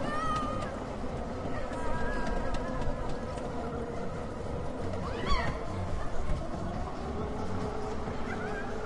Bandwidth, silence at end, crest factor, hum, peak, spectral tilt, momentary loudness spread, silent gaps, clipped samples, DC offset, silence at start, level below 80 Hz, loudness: 11 kHz; 0 s; 16 dB; none; -16 dBFS; -6.5 dB/octave; 5 LU; none; under 0.1%; under 0.1%; 0 s; -38 dBFS; -36 LUFS